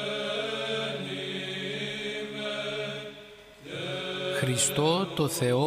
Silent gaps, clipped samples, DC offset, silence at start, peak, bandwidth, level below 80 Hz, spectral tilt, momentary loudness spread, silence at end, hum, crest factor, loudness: none; under 0.1%; under 0.1%; 0 s; -12 dBFS; 15.5 kHz; -64 dBFS; -3.5 dB/octave; 13 LU; 0 s; none; 18 dB; -30 LUFS